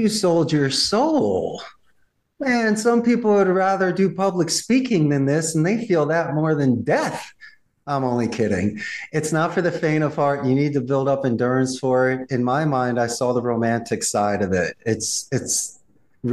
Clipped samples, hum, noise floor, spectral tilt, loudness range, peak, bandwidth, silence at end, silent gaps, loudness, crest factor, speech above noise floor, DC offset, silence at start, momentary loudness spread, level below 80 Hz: under 0.1%; none; -63 dBFS; -5 dB/octave; 3 LU; -8 dBFS; 12.5 kHz; 0 s; none; -20 LUFS; 12 dB; 43 dB; 0.1%; 0 s; 6 LU; -58 dBFS